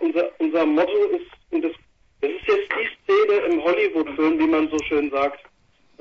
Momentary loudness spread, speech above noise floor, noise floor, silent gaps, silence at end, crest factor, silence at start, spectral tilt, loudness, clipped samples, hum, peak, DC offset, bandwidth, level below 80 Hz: 7 LU; 31 dB; -52 dBFS; none; 0.65 s; 14 dB; 0 s; -4.5 dB/octave; -21 LUFS; under 0.1%; none; -6 dBFS; under 0.1%; 7.8 kHz; -56 dBFS